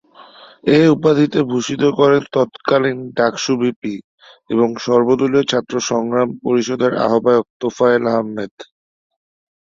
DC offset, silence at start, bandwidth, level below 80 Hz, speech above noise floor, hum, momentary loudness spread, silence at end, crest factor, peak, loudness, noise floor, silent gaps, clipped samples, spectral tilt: under 0.1%; 0.2 s; 7.8 kHz; -58 dBFS; 27 dB; none; 9 LU; 1 s; 16 dB; -2 dBFS; -16 LUFS; -42 dBFS; 3.76-3.82 s, 4.04-4.18 s, 7.50-7.60 s, 8.51-8.58 s; under 0.1%; -5.5 dB/octave